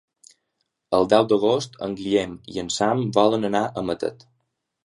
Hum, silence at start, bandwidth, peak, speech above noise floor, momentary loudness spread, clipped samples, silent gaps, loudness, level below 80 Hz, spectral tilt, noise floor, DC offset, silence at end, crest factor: none; 0.9 s; 11.5 kHz; -2 dBFS; 55 dB; 12 LU; under 0.1%; none; -22 LUFS; -58 dBFS; -5 dB/octave; -76 dBFS; under 0.1%; 0.7 s; 20 dB